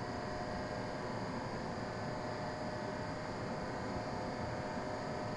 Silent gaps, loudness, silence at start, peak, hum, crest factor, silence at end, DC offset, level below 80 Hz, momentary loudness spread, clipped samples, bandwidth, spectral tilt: none; -41 LUFS; 0 s; -28 dBFS; none; 14 dB; 0 s; under 0.1%; -58 dBFS; 1 LU; under 0.1%; 11.5 kHz; -6 dB/octave